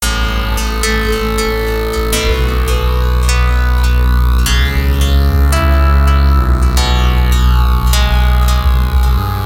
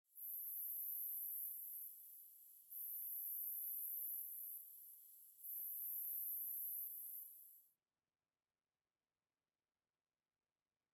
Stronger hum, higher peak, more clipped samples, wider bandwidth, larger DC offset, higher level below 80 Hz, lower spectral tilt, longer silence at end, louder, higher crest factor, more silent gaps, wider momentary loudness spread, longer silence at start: neither; first, 0 dBFS vs -34 dBFS; neither; second, 16.5 kHz vs over 20 kHz; neither; first, -12 dBFS vs under -90 dBFS; first, -5 dB/octave vs 3 dB/octave; second, 0 s vs 3.25 s; first, -13 LUFS vs -45 LUFS; second, 10 dB vs 18 dB; neither; second, 4 LU vs 15 LU; second, 0 s vs 0.15 s